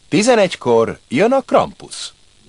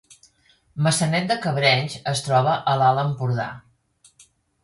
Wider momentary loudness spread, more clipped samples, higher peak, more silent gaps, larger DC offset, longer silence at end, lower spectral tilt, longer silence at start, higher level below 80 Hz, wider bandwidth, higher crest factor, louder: first, 15 LU vs 7 LU; neither; first, 0 dBFS vs -4 dBFS; neither; neither; second, 0.4 s vs 1.05 s; about the same, -4.5 dB/octave vs -4.5 dB/octave; second, 0.1 s vs 0.75 s; first, -52 dBFS vs -60 dBFS; about the same, 11.5 kHz vs 11.5 kHz; about the same, 16 dB vs 18 dB; first, -15 LUFS vs -21 LUFS